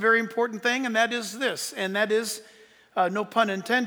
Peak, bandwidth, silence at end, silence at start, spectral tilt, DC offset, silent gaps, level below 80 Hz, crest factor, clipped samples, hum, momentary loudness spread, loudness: -8 dBFS; over 20 kHz; 0 s; 0 s; -3 dB/octave; under 0.1%; none; -80 dBFS; 18 dB; under 0.1%; none; 6 LU; -26 LUFS